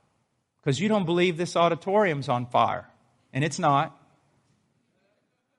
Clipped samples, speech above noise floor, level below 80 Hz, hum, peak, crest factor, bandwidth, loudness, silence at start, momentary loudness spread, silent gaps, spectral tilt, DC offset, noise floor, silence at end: under 0.1%; 49 dB; -68 dBFS; none; -8 dBFS; 20 dB; 11.5 kHz; -25 LUFS; 0.65 s; 9 LU; none; -5.5 dB/octave; under 0.1%; -73 dBFS; 1.65 s